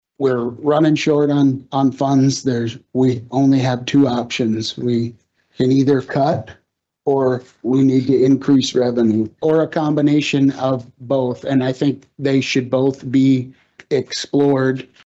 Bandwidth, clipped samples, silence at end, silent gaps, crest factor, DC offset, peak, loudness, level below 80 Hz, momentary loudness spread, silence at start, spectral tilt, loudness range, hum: 8 kHz; under 0.1%; 0.2 s; none; 12 dB; under 0.1%; -6 dBFS; -17 LUFS; -58 dBFS; 7 LU; 0.2 s; -6.5 dB/octave; 3 LU; none